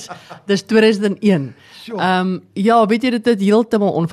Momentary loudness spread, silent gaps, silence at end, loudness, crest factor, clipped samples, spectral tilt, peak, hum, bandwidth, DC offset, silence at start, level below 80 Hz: 12 LU; none; 0 s; -16 LUFS; 12 dB; under 0.1%; -6.5 dB/octave; -2 dBFS; none; 13 kHz; under 0.1%; 0 s; -62 dBFS